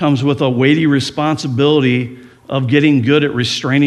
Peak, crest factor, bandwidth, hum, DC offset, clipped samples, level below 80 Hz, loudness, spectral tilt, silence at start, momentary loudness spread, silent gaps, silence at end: 0 dBFS; 14 dB; 11.5 kHz; none; under 0.1%; under 0.1%; -54 dBFS; -14 LUFS; -6 dB/octave; 0 s; 7 LU; none; 0 s